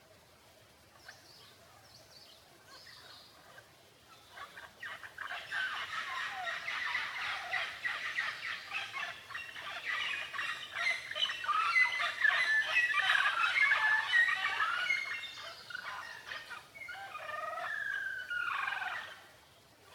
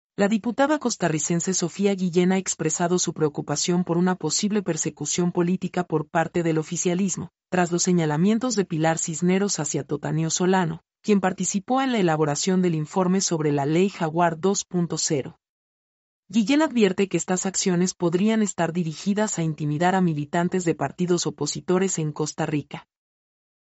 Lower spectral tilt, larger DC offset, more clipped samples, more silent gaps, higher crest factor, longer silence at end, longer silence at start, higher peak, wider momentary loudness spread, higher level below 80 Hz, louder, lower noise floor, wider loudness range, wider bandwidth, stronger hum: second, 0 dB/octave vs -5 dB/octave; neither; neither; second, none vs 15.49-16.23 s; about the same, 20 dB vs 18 dB; second, 0 s vs 0.9 s; about the same, 0.1 s vs 0.2 s; second, -16 dBFS vs -6 dBFS; first, 21 LU vs 5 LU; second, -78 dBFS vs -64 dBFS; second, -33 LUFS vs -23 LUFS; second, -61 dBFS vs under -90 dBFS; first, 14 LU vs 2 LU; first, 18 kHz vs 8.2 kHz; neither